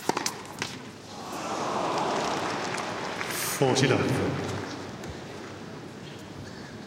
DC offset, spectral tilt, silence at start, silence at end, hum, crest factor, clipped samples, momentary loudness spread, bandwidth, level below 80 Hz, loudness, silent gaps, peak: under 0.1%; -4 dB/octave; 0 s; 0 s; none; 22 dB; under 0.1%; 17 LU; 16.5 kHz; -60 dBFS; -29 LUFS; none; -8 dBFS